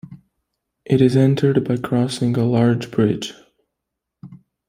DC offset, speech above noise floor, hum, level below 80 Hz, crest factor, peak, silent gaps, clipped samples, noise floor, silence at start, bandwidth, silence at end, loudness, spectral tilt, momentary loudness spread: under 0.1%; 64 dB; none; -56 dBFS; 18 dB; -2 dBFS; none; under 0.1%; -81 dBFS; 0.1 s; 14.5 kHz; 0.3 s; -18 LUFS; -7.5 dB/octave; 6 LU